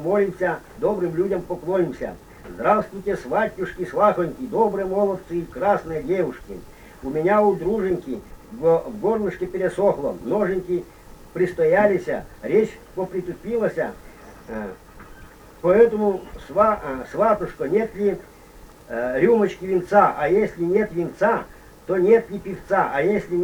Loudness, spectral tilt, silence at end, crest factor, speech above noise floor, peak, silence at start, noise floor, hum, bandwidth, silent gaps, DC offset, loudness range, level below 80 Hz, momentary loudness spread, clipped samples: -22 LUFS; -7.5 dB/octave; 0 s; 20 dB; 24 dB; -2 dBFS; 0 s; -45 dBFS; none; over 20 kHz; none; under 0.1%; 3 LU; -48 dBFS; 14 LU; under 0.1%